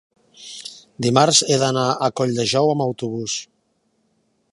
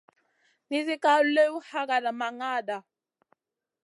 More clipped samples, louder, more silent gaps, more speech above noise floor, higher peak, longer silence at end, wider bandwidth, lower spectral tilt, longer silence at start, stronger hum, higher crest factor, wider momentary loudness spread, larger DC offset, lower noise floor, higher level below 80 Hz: neither; first, -19 LUFS vs -26 LUFS; neither; about the same, 48 dB vs 46 dB; first, 0 dBFS vs -10 dBFS; about the same, 1.1 s vs 1.05 s; about the same, 11.5 kHz vs 11.5 kHz; about the same, -4 dB/octave vs -3 dB/octave; second, 0.4 s vs 0.7 s; neither; about the same, 20 dB vs 18 dB; first, 20 LU vs 11 LU; neither; second, -67 dBFS vs -72 dBFS; first, -62 dBFS vs -88 dBFS